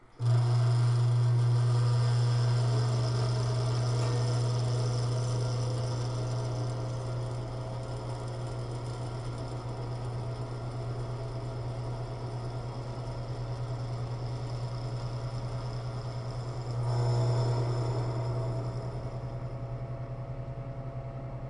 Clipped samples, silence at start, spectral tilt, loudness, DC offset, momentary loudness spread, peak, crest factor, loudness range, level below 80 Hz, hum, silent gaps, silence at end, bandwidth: under 0.1%; 0.05 s; -7 dB/octave; -32 LUFS; under 0.1%; 11 LU; -18 dBFS; 12 dB; 9 LU; -48 dBFS; none; none; 0 s; 10.5 kHz